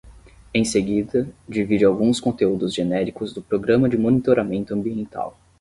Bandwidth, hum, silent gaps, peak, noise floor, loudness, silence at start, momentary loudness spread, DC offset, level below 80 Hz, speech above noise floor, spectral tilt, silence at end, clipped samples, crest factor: 11.5 kHz; none; none; -4 dBFS; -46 dBFS; -21 LUFS; 0.05 s; 10 LU; under 0.1%; -50 dBFS; 26 dB; -6 dB/octave; 0.3 s; under 0.1%; 18 dB